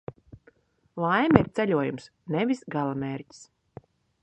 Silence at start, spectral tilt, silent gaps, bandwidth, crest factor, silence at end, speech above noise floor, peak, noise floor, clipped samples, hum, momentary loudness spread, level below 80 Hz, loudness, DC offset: 0.1 s; -7.5 dB/octave; none; 8.8 kHz; 28 dB; 0.8 s; 36 dB; 0 dBFS; -62 dBFS; under 0.1%; none; 20 LU; -54 dBFS; -26 LUFS; under 0.1%